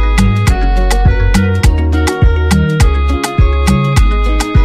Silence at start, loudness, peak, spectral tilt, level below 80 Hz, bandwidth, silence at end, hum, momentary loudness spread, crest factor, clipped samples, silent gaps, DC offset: 0 s; -12 LUFS; 0 dBFS; -6 dB/octave; -12 dBFS; 14 kHz; 0 s; none; 3 LU; 10 dB; under 0.1%; none; under 0.1%